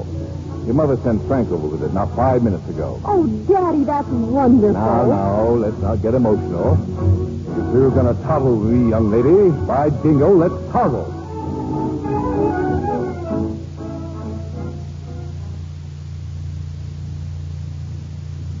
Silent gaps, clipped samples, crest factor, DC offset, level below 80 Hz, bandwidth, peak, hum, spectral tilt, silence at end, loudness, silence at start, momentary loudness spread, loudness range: none; under 0.1%; 16 dB; under 0.1%; -36 dBFS; 7.6 kHz; -2 dBFS; none; -10 dB/octave; 0 s; -18 LUFS; 0 s; 16 LU; 14 LU